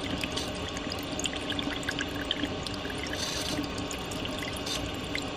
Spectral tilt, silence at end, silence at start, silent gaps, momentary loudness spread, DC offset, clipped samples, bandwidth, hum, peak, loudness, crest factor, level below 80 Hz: -3.5 dB/octave; 0 s; 0 s; none; 3 LU; under 0.1%; under 0.1%; 15.5 kHz; none; -12 dBFS; -32 LUFS; 20 dB; -46 dBFS